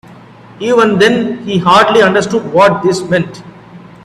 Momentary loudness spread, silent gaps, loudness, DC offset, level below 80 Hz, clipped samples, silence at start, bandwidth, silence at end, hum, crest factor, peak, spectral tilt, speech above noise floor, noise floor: 8 LU; none; -10 LUFS; under 0.1%; -48 dBFS; under 0.1%; 0.1 s; 13 kHz; 0.25 s; none; 12 dB; 0 dBFS; -5 dB/octave; 26 dB; -36 dBFS